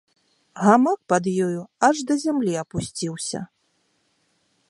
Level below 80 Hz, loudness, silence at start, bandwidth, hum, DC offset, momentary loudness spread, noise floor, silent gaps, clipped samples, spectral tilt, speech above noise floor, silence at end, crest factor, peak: -58 dBFS; -22 LUFS; 0.55 s; 11.5 kHz; none; under 0.1%; 12 LU; -68 dBFS; none; under 0.1%; -5 dB/octave; 47 dB; 1.25 s; 22 dB; -2 dBFS